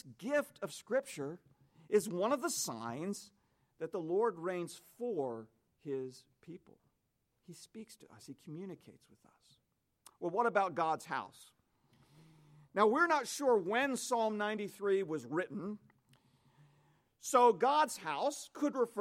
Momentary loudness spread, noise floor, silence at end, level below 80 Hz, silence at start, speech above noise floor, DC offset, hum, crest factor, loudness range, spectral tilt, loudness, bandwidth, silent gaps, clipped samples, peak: 21 LU; -81 dBFS; 0 s; -86 dBFS; 0.05 s; 46 dB; under 0.1%; none; 22 dB; 16 LU; -4 dB/octave; -35 LUFS; 16.5 kHz; none; under 0.1%; -16 dBFS